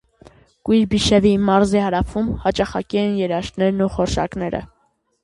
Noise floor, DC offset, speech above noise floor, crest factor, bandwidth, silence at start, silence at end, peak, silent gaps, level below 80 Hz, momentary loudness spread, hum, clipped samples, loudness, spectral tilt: -49 dBFS; under 0.1%; 31 dB; 18 dB; 11.5 kHz; 0.65 s; 0.6 s; -2 dBFS; none; -36 dBFS; 8 LU; none; under 0.1%; -19 LUFS; -6 dB/octave